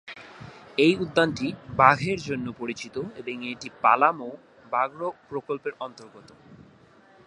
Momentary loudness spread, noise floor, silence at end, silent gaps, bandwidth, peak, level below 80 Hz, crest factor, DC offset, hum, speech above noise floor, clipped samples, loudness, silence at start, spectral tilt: 19 LU; -55 dBFS; 0.65 s; none; 11 kHz; -2 dBFS; -60 dBFS; 26 dB; under 0.1%; none; 30 dB; under 0.1%; -25 LUFS; 0.05 s; -5.5 dB/octave